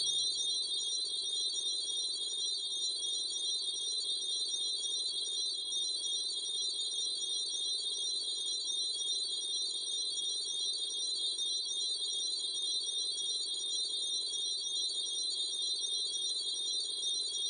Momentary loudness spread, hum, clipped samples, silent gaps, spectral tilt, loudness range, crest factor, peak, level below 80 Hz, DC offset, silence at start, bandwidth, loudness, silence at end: 1 LU; none; under 0.1%; none; 2.5 dB/octave; 0 LU; 14 dB; -22 dBFS; -86 dBFS; under 0.1%; 0 s; 11.5 kHz; -33 LUFS; 0 s